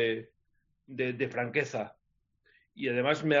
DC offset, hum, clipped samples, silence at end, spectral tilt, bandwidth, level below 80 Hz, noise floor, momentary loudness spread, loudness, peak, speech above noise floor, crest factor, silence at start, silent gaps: under 0.1%; none; under 0.1%; 0 s; -4 dB/octave; 7.4 kHz; -74 dBFS; -75 dBFS; 10 LU; -32 LUFS; -12 dBFS; 44 dB; 20 dB; 0 s; none